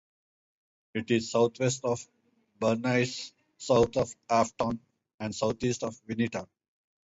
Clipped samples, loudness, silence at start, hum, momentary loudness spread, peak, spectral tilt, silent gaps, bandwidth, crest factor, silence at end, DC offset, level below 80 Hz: under 0.1%; -29 LUFS; 0.95 s; none; 13 LU; -12 dBFS; -5 dB/octave; 5.14-5.19 s; 8 kHz; 18 dB; 0.6 s; under 0.1%; -58 dBFS